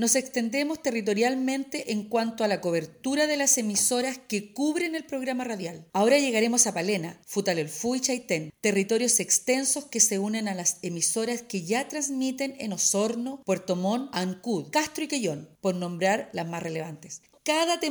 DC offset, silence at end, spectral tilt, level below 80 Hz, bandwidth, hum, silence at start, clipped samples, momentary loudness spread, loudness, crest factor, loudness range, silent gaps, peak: under 0.1%; 0 s; -3 dB/octave; -72 dBFS; over 20 kHz; none; 0 s; under 0.1%; 10 LU; -26 LUFS; 20 dB; 4 LU; none; -6 dBFS